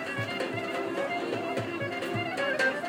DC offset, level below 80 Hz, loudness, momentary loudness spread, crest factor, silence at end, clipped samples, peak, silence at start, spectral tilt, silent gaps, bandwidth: under 0.1%; -70 dBFS; -31 LUFS; 5 LU; 16 dB; 0 s; under 0.1%; -14 dBFS; 0 s; -5 dB/octave; none; 16 kHz